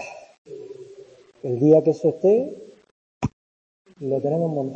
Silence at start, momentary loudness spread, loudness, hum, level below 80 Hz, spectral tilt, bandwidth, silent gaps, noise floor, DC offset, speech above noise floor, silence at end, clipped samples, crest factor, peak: 0 s; 24 LU; -21 LUFS; none; -56 dBFS; -9 dB/octave; 8 kHz; 0.38-0.45 s, 2.91-3.21 s, 3.33-3.85 s; -48 dBFS; under 0.1%; 28 dB; 0 s; under 0.1%; 20 dB; -4 dBFS